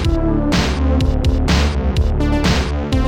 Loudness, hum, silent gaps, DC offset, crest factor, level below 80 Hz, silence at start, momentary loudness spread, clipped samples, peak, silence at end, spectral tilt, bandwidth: -17 LUFS; none; none; under 0.1%; 10 dB; -18 dBFS; 0 s; 2 LU; under 0.1%; -4 dBFS; 0 s; -6 dB/octave; 10.5 kHz